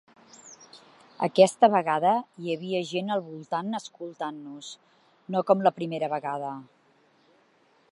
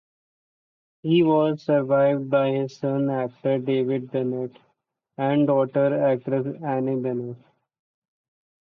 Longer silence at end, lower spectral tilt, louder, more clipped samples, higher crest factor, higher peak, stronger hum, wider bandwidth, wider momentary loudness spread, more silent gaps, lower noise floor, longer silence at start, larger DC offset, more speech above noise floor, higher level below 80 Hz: about the same, 1.3 s vs 1.25 s; second, -5.5 dB/octave vs -9 dB/octave; second, -26 LUFS vs -23 LUFS; neither; first, 24 dB vs 14 dB; first, -4 dBFS vs -10 dBFS; neither; first, 11.5 kHz vs 6.4 kHz; first, 21 LU vs 8 LU; neither; second, -64 dBFS vs -72 dBFS; second, 0.45 s vs 1.05 s; neither; second, 38 dB vs 50 dB; second, -84 dBFS vs -70 dBFS